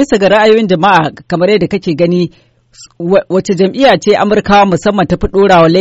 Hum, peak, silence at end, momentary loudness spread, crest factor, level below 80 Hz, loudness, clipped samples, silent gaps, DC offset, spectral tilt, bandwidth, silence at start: none; 0 dBFS; 0 s; 7 LU; 10 dB; -32 dBFS; -10 LUFS; 0.3%; none; 0.3%; -6 dB/octave; 8.2 kHz; 0 s